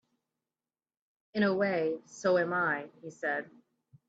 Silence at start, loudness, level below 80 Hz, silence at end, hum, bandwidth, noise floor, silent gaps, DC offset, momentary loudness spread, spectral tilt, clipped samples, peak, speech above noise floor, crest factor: 1.35 s; -31 LUFS; -80 dBFS; 0.6 s; none; 8 kHz; under -90 dBFS; none; under 0.1%; 11 LU; -6 dB/octave; under 0.1%; -16 dBFS; over 59 dB; 16 dB